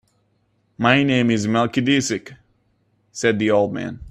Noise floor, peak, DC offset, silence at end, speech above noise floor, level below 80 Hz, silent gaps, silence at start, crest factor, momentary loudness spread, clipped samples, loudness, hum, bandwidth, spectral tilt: -65 dBFS; 0 dBFS; under 0.1%; 0 s; 46 dB; -52 dBFS; none; 0.8 s; 20 dB; 10 LU; under 0.1%; -19 LUFS; none; 12.5 kHz; -5 dB/octave